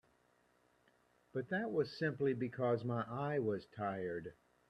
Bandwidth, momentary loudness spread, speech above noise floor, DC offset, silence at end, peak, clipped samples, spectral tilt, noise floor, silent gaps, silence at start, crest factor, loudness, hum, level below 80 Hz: 9 kHz; 8 LU; 36 dB; under 0.1%; 0.35 s; -22 dBFS; under 0.1%; -8.5 dB/octave; -74 dBFS; none; 1.35 s; 18 dB; -39 LUFS; none; -76 dBFS